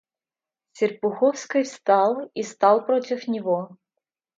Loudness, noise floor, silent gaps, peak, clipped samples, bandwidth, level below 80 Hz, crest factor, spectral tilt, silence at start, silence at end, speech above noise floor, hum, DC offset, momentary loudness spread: -23 LUFS; under -90 dBFS; none; -4 dBFS; under 0.1%; 7.8 kHz; -78 dBFS; 18 dB; -5 dB/octave; 0.75 s; 0.65 s; over 68 dB; none; under 0.1%; 8 LU